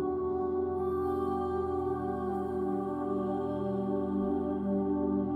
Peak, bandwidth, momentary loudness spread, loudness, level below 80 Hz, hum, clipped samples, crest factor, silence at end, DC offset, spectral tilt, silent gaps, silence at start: -20 dBFS; 4.6 kHz; 3 LU; -32 LUFS; -56 dBFS; none; under 0.1%; 12 dB; 0 s; under 0.1%; -10 dB/octave; none; 0 s